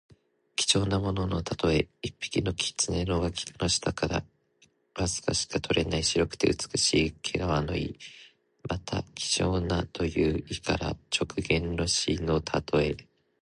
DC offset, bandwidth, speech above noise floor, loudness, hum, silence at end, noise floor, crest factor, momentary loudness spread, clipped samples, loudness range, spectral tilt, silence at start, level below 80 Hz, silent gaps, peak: under 0.1%; 11.5 kHz; 38 dB; -28 LUFS; none; 0.4 s; -66 dBFS; 22 dB; 9 LU; under 0.1%; 3 LU; -4 dB/octave; 0.6 s; -44 dBFS; none; -6 dBFS